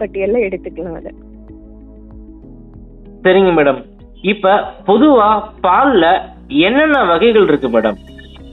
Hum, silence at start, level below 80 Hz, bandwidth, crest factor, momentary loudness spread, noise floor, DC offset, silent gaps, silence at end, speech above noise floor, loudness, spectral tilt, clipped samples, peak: none; 0 s; -40 dBFS; 4.1 kHz; 14 dB; 15 LU; -36 dBFS; under 0.1%; none; 0 s; 24 dB; -12 LUFS; -8 dB/octave; under 0.1%; 0 dBFS